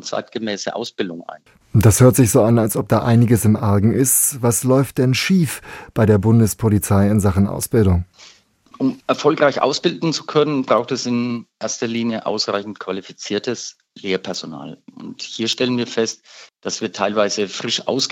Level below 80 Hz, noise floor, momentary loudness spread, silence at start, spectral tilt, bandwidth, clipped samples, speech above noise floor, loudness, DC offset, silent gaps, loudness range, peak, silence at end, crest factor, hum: -48 dBFS; -49 dBFS; 14 LU; 0.05 s; -5 dB/octave; 17 kHz; under 0.1%; 32 dB; -18 LUFS; under 0.1%; none; 9 LU; -2 dBFS; 0 s; 16 dB; none